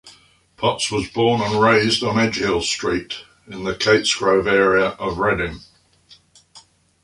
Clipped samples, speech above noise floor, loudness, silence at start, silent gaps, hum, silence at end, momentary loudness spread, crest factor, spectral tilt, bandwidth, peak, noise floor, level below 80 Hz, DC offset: under 0.1%; 34 dB; -18 LUFS; 0.05 s; none; none; 0.45 s; 12 LU; 18 dB; -4 dB/octave; 11.5 kHz; -2 dBFS; -52 dBFS; -46 dBFS; under 0.1%